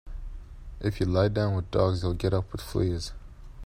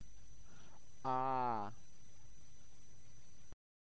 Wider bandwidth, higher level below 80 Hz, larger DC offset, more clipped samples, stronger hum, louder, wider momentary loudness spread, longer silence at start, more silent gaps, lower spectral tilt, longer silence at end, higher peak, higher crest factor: first, 15.5 kHz vs 8 kHz; first, -40 dBFS vs -68 dBFS; second, under 0.1% vs 0.7%; neither; neither; first, -28 LUFS vs -40 LUFS; second, 20 LU vs 27 LU; about the same, 0.05 s vs 0 s; neither; first, -7 dB/octave vs -5.5 dB/octave; second, 0 s vs 0.6 s; first, -10 dBFS vs -26 dBFS; about the same, 18 dB vs 18 dB